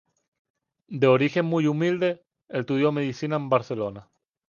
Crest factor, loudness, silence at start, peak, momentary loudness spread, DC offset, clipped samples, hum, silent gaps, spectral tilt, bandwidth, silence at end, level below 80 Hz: 18 dB; -24 LUFS; 0.9 s; -6 dBFS; 12 LU; under 0.1%; under 0.1%; none; none; -7.5 dB/octave; 7.2 kHz; 0.45 s; -68 dBFS